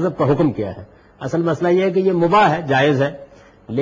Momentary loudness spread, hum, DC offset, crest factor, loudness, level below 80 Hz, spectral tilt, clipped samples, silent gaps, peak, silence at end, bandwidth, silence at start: 13 LU; none; under 0.1%; 14 dB; -17 LUFS; -52 dBFS; -7.5 dB/octave; under 0.1%; none; -4 dBFS; 0 s; 7.6 kHz; 0 s